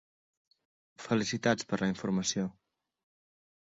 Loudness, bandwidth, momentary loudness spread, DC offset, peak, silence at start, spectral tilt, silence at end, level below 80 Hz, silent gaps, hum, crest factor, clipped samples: -32 LUFS; 8 kHz; 7 LU; under 0.1%; -12 dBFS; 1 s; -4.5 dB/octave; 1.1 s; -68 dBFS; none; none; 22 dB; under 0.1%